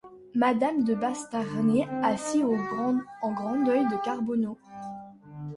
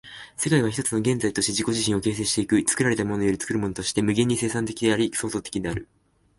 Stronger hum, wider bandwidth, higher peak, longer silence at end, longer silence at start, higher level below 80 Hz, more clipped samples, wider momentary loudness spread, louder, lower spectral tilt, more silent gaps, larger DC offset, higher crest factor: neither; about the same, 11.5 kHz vs 12 kHz; second, -12 dBFS vs -8 dBFS; second, 0 s vs 0.55 s; about the same, 0.05 s vs 0.05 s; second, -66 dBFS vs -50 dBFS; neither; first, 16 LU vs 7 LU; second, -27 LUFS vs -24 LUFS; first, -6 dB/octave vs -4 dB/octave; neither; neither; about the same, 16 dB vs 16 dB